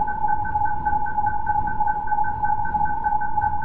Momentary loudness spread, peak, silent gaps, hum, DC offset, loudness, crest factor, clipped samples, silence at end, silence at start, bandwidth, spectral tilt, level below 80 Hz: 1 LU; -10 dBFS; none; none; 5%; -23 LUFS; 14 dB; under 0.1%; 0 s; 0 s; 3.1 kHz; -9.5 dB/octave; -36 dBFS